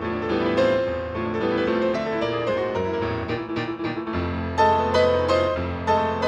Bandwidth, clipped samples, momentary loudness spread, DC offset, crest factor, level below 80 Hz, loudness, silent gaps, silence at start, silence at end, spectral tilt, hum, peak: 9.2 kHz; under 0.1%; 8 LU; under 0.1%; 16 dB; -44 dBFS; -23 LUFS; none; 0 s; 0 s; -6.5 dB/octave; none; -8 dBFS